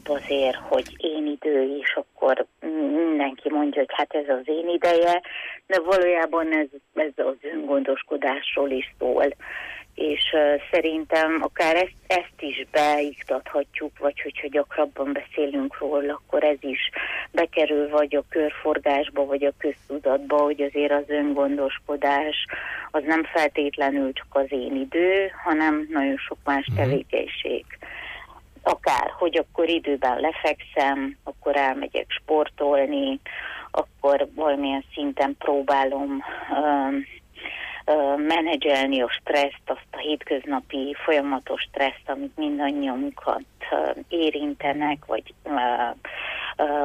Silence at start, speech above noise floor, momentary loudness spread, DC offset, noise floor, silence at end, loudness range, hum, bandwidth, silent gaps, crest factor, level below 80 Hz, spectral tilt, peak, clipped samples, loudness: 0.05 s; 21 dB; 8 LU; under 0.1%; -44 dBFS; 0 s; 3 LU; none; 14 kHz; none; 14 dB; -56 dBFS; -5.5 dB/octave; -10 dBFS; under 0.1%; -24 LUFS